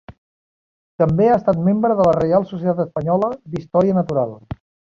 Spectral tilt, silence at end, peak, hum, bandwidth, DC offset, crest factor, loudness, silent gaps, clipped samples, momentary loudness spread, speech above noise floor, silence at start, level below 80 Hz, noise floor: -10 dB/octave; 0.55 s; -2 dBFS; none; 7.2 kHz; under 0.1%; 16 dB; -18 LUFS; 0.18-0.99 s; under 0.1%; 12 LU; over 73 dB; 0.1 s; -48 dBFS; under -90 dBFS